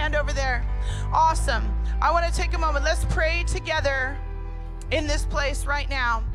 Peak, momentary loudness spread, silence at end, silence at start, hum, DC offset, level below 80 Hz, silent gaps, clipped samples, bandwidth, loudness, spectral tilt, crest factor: -10 dBFS; 8 LU; 0 s; 0 s; none; under 0.1%; -26 dBFS; none; under 0.1%; 12.5 kHz; -24 LUFS; -4.5 dB/octave; 14 dB